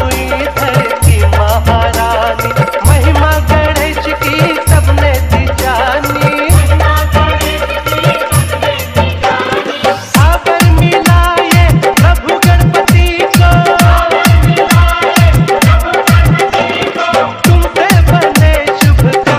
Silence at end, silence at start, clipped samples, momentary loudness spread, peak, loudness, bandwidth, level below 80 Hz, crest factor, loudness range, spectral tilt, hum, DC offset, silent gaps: 0 s; 0 s; 0.7%; 5 LU; 0 dBFS; -9 LUFS; 16.5 kHz; -14 dBFS; 8 dB; 3 LU; -5.5 dB/octave; none; under 0.1%; none